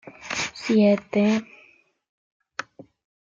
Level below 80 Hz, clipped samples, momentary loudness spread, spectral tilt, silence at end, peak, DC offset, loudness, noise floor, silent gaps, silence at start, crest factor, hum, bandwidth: -66 dBFS; under 0.1%; 17 LU; -5.5 dB/octave; 0.6 s; -8 dBFS; under 0.1%; -22 LUFS; -57 dBFS; 2.09-2.40 s; 0.05 s; 18 dB; none; 7.6 kHz